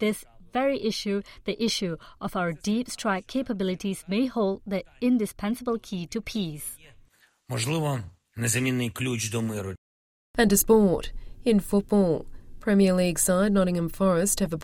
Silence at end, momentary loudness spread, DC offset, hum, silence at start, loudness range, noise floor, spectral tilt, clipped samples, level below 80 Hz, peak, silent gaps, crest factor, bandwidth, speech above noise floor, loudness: 0 s; 12 LU; under 0.1%; none; 0 s; 7 LU; -58 dBFS; -5 dB/octave; under 0.1%; -46 dBFS; -8 dBFS; 9.78-10.34 s; 18 dB; 16.5 kHz; 33 dB; -26 LUFS